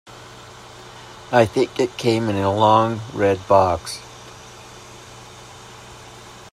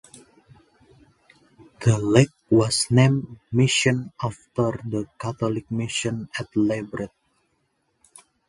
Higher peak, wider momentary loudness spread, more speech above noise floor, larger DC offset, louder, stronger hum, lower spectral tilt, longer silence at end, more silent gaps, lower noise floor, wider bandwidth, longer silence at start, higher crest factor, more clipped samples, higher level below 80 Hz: about the same, -2 dBFS vs 0 dBFS; first, 24 LU vs 12 LU; second, 23 dB vs 49 dB; neither; first, -19 LUFS vs -23 LUFS; neither; about the same, -5.5 dB/octave vs -5.5 dB/octave; second, 0.05 s vs 1.4 s; neither; second, -41 dBFS vs -71 dBFS; first, 14 kHz vs 11.5 kHz; second, 0.1 s vs 1.8 s; about the same, 20 dB vs 24 dB; neither; about the same, -54 dBFS vs -54 dBFS